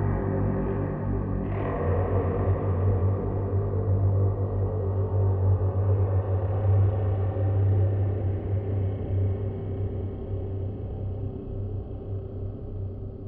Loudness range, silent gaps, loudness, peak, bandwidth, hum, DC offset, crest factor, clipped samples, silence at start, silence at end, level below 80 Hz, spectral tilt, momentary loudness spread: 7 LU; none; -27 LUFS; -12 dBFS; 3 kHz; none; under 0.1%; 12 dB; under 0.1%; 0 s; 0 s; -38 dBFS; -13.5 dB/octave; 10 LU